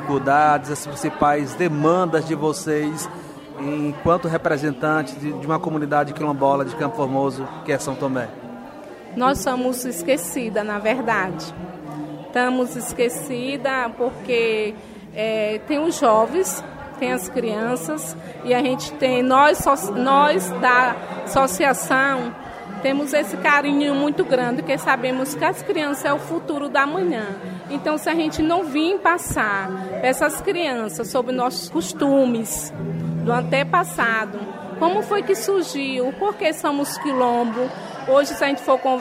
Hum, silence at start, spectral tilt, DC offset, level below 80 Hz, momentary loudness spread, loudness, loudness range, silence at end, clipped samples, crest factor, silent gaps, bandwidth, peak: none; 0 s; -4.5 dB/octave; under 0.1%; -52 dBFS; 11 LU; -21 LUFS; 5 LU; 0 s; under 0.1%; 18 dB; none; 16 kHz; -2 dBFS